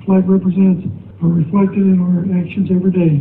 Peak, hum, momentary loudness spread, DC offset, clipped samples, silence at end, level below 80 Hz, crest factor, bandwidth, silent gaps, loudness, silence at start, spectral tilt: -2 dBFS; none; 6 LU; under 0.1%; under 0.1%; 0 s; -50 dBFS; 10 dB; 3.6 kHz; none; -14 LUFS; 0 s; -13.5 dB/octave